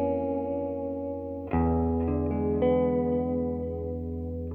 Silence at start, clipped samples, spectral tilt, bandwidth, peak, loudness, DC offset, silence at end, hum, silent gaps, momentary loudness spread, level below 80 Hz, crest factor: 0 s; under 0.1%; -12 dB/octave; 3.5 kHz; -14 dBFS; -29 LUFS; under 0.1%; 0 s; 50 Hz at -65 dBFS; none; 9 LU; -40 dBFS; 14 dB